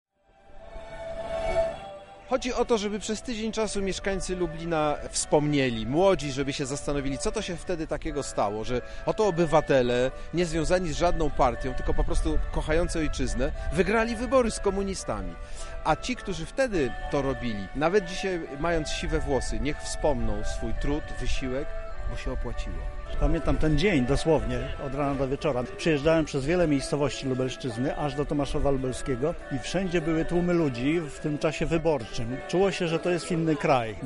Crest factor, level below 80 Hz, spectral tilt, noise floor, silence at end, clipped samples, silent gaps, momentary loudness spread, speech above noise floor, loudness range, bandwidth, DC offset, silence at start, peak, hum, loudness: 18 dB; -34 dBFS; -5.5 dB/octave; -53 dBFS; 0 s; under 0.1%; none; 10 LU; 27 dB; 4 LU; 11.5 kHz; under 0.1%; 0.5 s; -8 dBFS; none; -28 LUFS